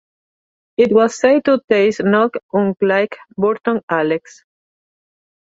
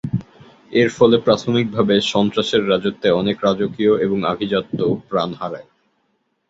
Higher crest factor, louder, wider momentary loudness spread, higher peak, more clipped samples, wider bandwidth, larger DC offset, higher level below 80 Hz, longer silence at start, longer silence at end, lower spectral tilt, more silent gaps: about the same, 16 dB vs 18 dB; about the same, -16 LUFS vs -18 LUFS; second, 7 LU vs 10 LU; about the same, -2 dBFS vs -2 dBFS; neither; about the same, 8 kHz vs 8 kHz; neither; second, -62 dBFS vs -54 dBFS; first, 0.8 s vs 0.05 s; first, 1.4 s vs 0.9 s; about the same, -6 dB/octave vs -6 dB/octave; first, 1.64-1.68 s, 2.43-2.49 s, 3.83-3.88 s vs none